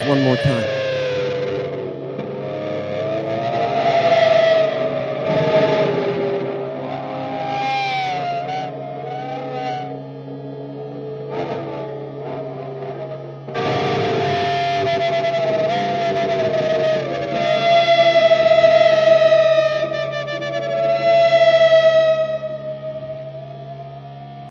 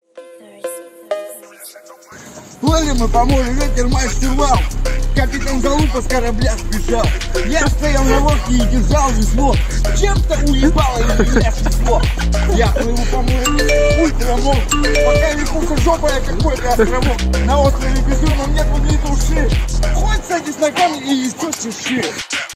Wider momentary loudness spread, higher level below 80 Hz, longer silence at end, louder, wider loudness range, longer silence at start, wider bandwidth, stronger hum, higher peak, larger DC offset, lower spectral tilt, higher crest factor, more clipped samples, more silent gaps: first, 17 LU vs 7 LU; second, -56 dBFS vs -16 dBFS; about the same, 0 s vs 0 s; about the same, -18 LUFS vs -16 LUFS; first, 13 LU vs 3 LU; second, 0 s vs 0.15 s; second, 7.2 kHz vs 15.5 kHz; neither; about the same, -2 dBFS vs 0 dBFS; neither; about the same, -6 dB/octave vs -5 dB/octave; about the same, 16 dB vs 14 dB; neither; neither